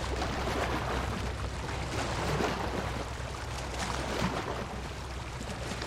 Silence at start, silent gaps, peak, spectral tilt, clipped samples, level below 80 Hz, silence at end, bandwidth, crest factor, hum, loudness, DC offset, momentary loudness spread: 0 s; none; -16 dBFS; -4.5 dB/octave; under 0.1%; -40 dBFS; 0 s; 16 kHz; 16 dB; none; -34 LUFS; under 0.1%; 7 LU